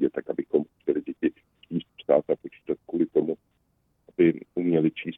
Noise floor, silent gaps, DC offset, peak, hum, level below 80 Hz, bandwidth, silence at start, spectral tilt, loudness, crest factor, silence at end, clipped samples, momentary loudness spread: -70 dBFS; none; under 0.1%; -6 dBFS; none; -66 dBFS; 3.9 kHz; 0 s; -10.5 dB/octave; -27 LUFS; 20 dB; 0 s; under 0.1%; 11 LU